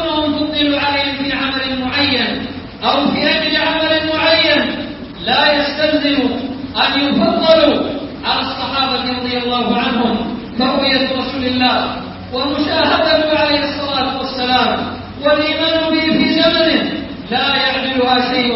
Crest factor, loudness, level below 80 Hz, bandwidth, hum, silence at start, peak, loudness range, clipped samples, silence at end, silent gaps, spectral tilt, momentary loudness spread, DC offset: 16 dB; -14 LUFS; -42 dBFS; 5.8 kHz; none; 0 s; 0 dBFS; 2 LU; under 0.1%; 0 s; none; -8 dB/octave; 9 LU; under 0.1%